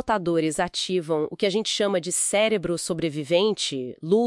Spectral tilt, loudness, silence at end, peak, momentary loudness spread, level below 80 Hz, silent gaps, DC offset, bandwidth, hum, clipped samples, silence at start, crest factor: -3.5 dB/octave; -24 LUFS; 0 s; -8 dBFS; 6 LU; -56 dBFS; none; under 0.1%; 12 kHz; none; under 0.1%; 0 s; 16 dB